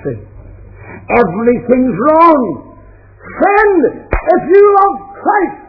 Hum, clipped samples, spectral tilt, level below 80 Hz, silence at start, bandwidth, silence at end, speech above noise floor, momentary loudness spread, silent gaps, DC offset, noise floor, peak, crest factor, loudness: none; 0.5%; -10 dB/octave; -32 dBFS; 0 s; 5.4 kHz; 0.1 s; 28 dB; 13 LU; none; under 0.1%; -38 dBFS; 0 dBFS; 12 dB; -10 LUFS